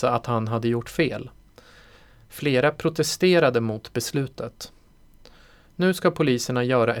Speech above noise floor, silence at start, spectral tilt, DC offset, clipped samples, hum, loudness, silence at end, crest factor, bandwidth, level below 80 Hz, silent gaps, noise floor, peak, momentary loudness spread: 30 dB; 0 s; -5.5 dB/octave; under 0.1%; under 0.1%; none; -23 LUFS; 0 s; 18 dB; 20 kHz; -54 dBFS; none; -52 dBFS; -6 dBFS; 16 LU